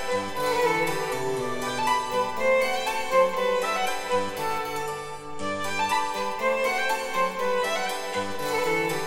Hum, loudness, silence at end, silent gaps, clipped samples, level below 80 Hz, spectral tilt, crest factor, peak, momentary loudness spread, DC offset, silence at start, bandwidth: none; -26 LUFS; 0 s; none; under 0.1%; -56 dBFS; -3 dB/octave; 16 dB; -10 dBFS; 7 LU; under 0.1%; 0 s; 17.5 kHz